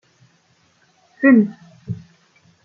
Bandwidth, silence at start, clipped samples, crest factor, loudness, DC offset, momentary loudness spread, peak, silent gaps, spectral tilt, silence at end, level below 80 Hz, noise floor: 6.2 kHz; 1.2 s; under 0.1%; 18 dB; -15 LUFS; under 0.1%; 20 LU; -2 dBFS; none; -9.5 dB/octave; 0.7 s; -64 dBFS; -59 dBFS